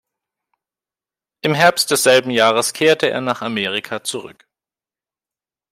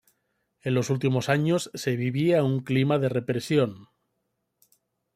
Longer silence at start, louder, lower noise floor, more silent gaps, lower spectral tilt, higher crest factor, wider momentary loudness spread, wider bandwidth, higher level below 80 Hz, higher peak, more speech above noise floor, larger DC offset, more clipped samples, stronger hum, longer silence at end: first, 1.45 s vs 0.65 s; first, -16 LUFS vs -25 LUFS; first, under -90 dBFS vs -78 dBFS; neither; second, -3 dB/octave vs -6.5 dB/octave; about the same, 18 dB vs 18 dB; first, 11 LU vs 5 LU; first, 16 kHz vs 14.5 kHz; about the same, -66 dBFS vs -66 dBFS; first, 0 dBFS vs -8 dBFS; first, over 73 dB vs 53 dB; neither; neither; neither; about the same, 1.4 s vs 1.3 s